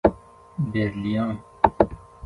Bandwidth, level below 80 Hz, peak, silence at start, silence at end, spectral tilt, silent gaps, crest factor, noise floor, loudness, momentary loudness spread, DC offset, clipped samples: 10.5 kHz; -42 dBFS; 0 dBFS; 0.05 s; 0 s; -9 dB/octave; none; 24 dB; -41 dBFS; -24 LUFS; 9 LU; under 0.1%; under 0.1%